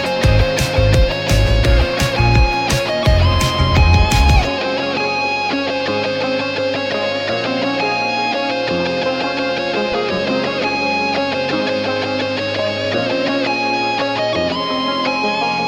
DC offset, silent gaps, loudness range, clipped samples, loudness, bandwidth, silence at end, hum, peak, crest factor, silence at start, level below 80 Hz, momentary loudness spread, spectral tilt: under 0.1%; none; 4 LU; under 0.1%; -16 LUFS; 16.5 kHz; 0 s; none; -2 dBFS; 14 dB; 0 s; -22 dBFS; 5 LU; -5 dB/octave